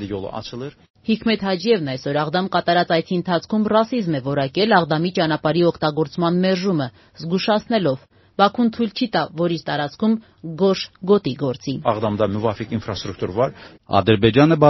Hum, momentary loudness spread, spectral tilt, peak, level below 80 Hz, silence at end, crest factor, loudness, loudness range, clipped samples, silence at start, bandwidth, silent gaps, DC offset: none; 10 LU; -5 dB/octave; 0 dBFS; -52 dBFS; 0 s; 20 dB; -20 LUFS; 2 LU; under 0.1%; 0 s; 6.2 kHz; 0.90-0.94 s; under 0.1%